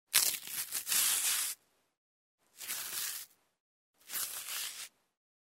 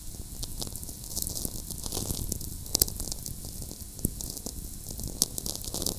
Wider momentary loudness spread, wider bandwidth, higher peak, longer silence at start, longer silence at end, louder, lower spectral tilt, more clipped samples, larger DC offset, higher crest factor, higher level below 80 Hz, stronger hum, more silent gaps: first, 18 LU vs 13 LU; about the same, 16.5 kHz vs 16 kHz; second, -6 dBFS vs 0 dBFS; about the same, 0.1 s vs 0 s; first, 0.7 s vs 0 s; about the same, -33 LUFS vs -32 LUFS; second, 3 dB/octave vs -2.5 dB/octave; neither; neither; about the same, 32 dB vs 34 dB; second, -86 dBFS vs -42 dBFS; neither; first, 1.97-2.38 s, 3.60-3.94 s vs none